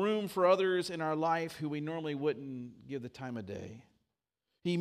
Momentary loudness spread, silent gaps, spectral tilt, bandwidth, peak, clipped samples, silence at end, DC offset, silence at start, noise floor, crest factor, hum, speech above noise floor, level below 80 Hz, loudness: 16 LU; none; -6 dB/octave; 15.5 kHz; -14 dBFS; under 0.1%; 0 s; under 0.1%; 0 s; -87 dBFS; 20 dB; none; 53 dB; -76 dBFS; -34 LUFS